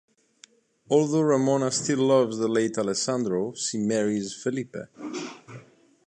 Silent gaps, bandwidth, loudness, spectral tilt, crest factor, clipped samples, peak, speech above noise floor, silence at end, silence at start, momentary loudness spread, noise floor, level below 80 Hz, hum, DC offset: none; 10 kHz; -25 LUFS; -5 dB/octave; 18 dB; under 0.1%; -8 dBFS; 32 dB; 0.45 s; 0.9 s; 15 LU; -57 dBFS; -70 dBFS; none; under 0.1%